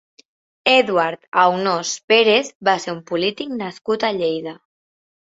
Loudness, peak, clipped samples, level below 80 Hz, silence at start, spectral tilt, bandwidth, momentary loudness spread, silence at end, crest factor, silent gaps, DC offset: -18 LUFS; 0 dBFS; under 0.1%; -66 dBFS; 0.65 s; -3 dB/octave; 8 kHz; 12 LU; 0.75 s; 20 dB; 1.28-1.32 s, 2.04-2.08 s, 2.55-2.60 s; under 0.1%